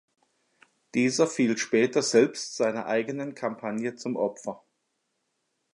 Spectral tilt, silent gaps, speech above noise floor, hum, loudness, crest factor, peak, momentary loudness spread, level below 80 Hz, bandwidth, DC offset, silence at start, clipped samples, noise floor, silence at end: -4 dB/octave; none; 51 dB; none; -26 LUFS; 20 dB; -8 dBFS; 10 LU; -78 dBFS; 11.5 kHz; under 0.1%; 0.95 s; under 0.1%; -77 dBFS; 1.2 s